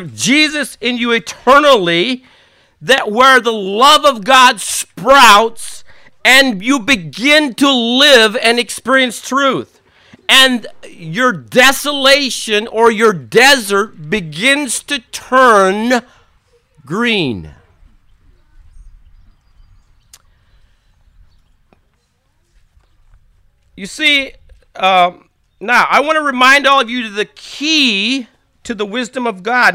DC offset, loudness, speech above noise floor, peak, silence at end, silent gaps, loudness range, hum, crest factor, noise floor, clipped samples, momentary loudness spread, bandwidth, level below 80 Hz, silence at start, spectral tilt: under 0.1%; -11 LUFS; 48 dB; 0 dBFS; 0 s; none; 11 LU; none; 14 dB; -60 dBFS; 0.3%; 13 LU; 18.5 kHz; -48 dBFS; 0 s; -2.5 dB/octave